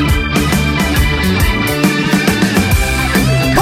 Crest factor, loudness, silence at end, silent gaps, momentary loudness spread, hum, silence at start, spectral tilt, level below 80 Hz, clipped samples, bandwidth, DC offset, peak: 12 dB; -13 LUFS; 0 s; none; 1 LU; none; 0 s; -5 dB/octave; -20 dBFS; under 0.1%; 16.5 kHz; under 0.1%; 0 dBFS